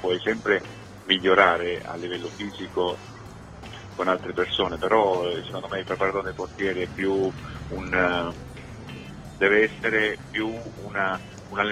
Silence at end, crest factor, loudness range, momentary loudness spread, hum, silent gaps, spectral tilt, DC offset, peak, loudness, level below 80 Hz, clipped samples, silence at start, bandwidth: 0 s; 24 dB; 3 LU; 19 LU; none; none; -5 dB/octave; under 0.1%; -2 dBFS; -25 LUFS; -50 dBFS; under 0.1%; 0 s; 13 kHz